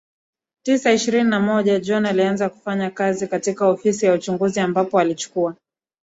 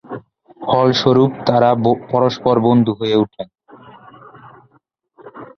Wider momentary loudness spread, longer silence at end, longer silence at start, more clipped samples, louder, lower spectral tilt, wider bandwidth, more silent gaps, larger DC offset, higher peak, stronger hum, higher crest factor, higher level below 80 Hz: second, 6 LU vs 20 LU; first, 0.5 s vs 0.15 s; first, 0.65 s vs 0.1 s; neither; second, -20 LUFS vs -15 LUFS; second, -5 dB/octave vs -7.5 dB/octave; first, 8 kHz vs 6.6 kHz; neither; neither; second, -4 dBFS vs 0 dBFS; neither; about the same, 16 dB vs 18 dB; second, -64 dBFS vs -54 dBFS